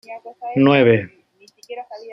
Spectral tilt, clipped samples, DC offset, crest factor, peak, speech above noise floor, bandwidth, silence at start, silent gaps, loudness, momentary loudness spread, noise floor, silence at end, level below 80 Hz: -8 dB/octave; under 0.1%; under 0.1%; 18 dB; 0 dBFS; 33 dB; 6.4 kHz; 0.1 s; none; -16 LUFS; 23 LU; -51 dBFS; 0 s; -62 dBFS